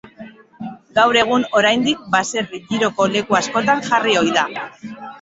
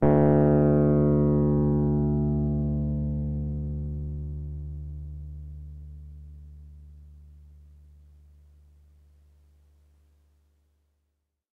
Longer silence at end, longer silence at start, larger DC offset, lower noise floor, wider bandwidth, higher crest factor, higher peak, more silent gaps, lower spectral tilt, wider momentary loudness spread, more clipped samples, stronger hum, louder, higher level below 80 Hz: second, 0.05 s vs 4.3 s; about the same, 0.05 s vs 0 s; neither; second, -40 dBFS vs -78 dBFS; first, 8.2 kHz vs 2.6 kHz; about the same, 18 dB vs 20 dB; first, -2 dBFS vs -8 dBFS; neither; second, -3.5 dB/octave vs -13 dB/octave; second, 18 LU vs 24 LU; neither; neither; first, -17 LUFS vs -25 LUFS; second, -58 dBFS vs -38 dBFS